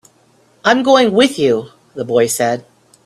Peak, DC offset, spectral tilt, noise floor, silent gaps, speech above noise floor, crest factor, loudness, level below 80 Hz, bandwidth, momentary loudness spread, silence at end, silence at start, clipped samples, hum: 0 dBFS; under 0.1%; -3.5 dB/octave; -53 dBFS; none; 40 dB; 16 dB; -14 LUFS; -58 dBFS; 13.5 kHz; 13 LU; 0.45 s; 0.65 s; under 0.1%; none